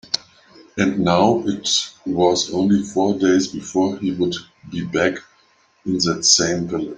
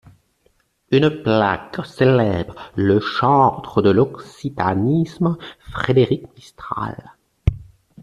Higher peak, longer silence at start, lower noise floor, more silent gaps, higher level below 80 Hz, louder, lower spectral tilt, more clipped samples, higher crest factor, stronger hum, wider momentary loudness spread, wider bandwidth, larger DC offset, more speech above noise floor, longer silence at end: about the same, 0 dBFS vs -2 dBFS; second, 0.15 s vs 0.9 s; second, -58 dBFS vs -62 dBFS; neither; second, -56 dBFS vs -40 dBFS; about the same, -19 LUFS vs -19 LUFS; second, -3.5 dB/octave vs -8 dB/octave; neither; about the same, 18 dB vs 18 dB; neither; second, 10 LU vs 14 LU; about the same, 10 kHz vs 11 kHz; neither; second, 39 dB vs 44 dB; second, 0 s vs 0.4 s